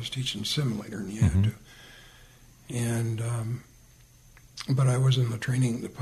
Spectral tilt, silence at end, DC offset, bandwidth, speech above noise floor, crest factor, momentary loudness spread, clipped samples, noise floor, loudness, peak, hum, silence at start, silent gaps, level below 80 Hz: -5.5 dB/octave; 0 s; under 0.1%; 13.5 kHz; 28 dB; 16 dB; 19 LU; under 0.1%; -55 dBFS; -28 LUFS; -12 dBFS; none; 0 s; none; -48 dBFS